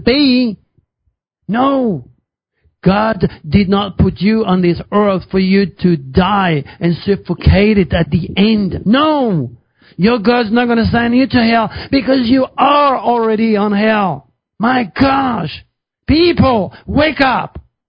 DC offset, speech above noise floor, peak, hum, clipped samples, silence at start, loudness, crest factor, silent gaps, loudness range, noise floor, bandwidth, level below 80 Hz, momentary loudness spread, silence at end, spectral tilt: under 0.1%; 54 dB; 0 dBFS; none; under 0.1%; 0 s; -13 LUFS; 14 dB; none; 3 LU; -66 dBFS; 5.4 kHz; -30 dBFS; 7 LU; 0.3 s; -10 dB/octave